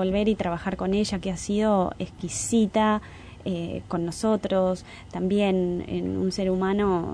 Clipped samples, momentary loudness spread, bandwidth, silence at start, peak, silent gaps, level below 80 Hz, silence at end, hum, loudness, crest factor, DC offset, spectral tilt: under 0.1%; 8 LU; 11 kHz; 0 s; -12 dBFS; none; -46 dBFS; 0 s; none; -26 LUFS; 14 dB; under 0.1%; -5.5 dB/octave